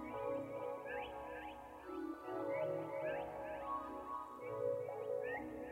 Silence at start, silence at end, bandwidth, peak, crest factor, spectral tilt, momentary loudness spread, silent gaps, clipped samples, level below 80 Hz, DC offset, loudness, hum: 0 s; 0 s; 16 kHz; -30 dBFS; 14 dB; -6.5 dB/octave; 7 LU; none; under 0.1%; -70 dBFS; under 0.1%; -44 LUFS; none